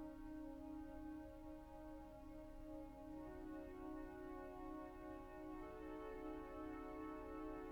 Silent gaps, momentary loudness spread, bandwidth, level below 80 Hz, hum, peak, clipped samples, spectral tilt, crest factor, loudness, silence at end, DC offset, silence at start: none; 6 LU; 19 kHz; -62 dBFS; none; -40 dBFS; under 0.1%; -7.5 dB/octave; 14 dB; -54 LUFS; 0 s; under 0.1%; 0 s